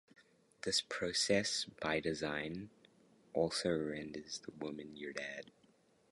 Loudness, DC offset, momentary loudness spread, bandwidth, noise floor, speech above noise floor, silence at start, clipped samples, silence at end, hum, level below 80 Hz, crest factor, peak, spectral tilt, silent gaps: -38 LUFS; under 0.1%; 13 LU; 11.5 kHz; -71 dBFS; 32 dB; 0.65 s; under 0.1%; 0.7 s; none; -68 dBFS; 20 dB; -20 dBFS; -3 dB/octave; none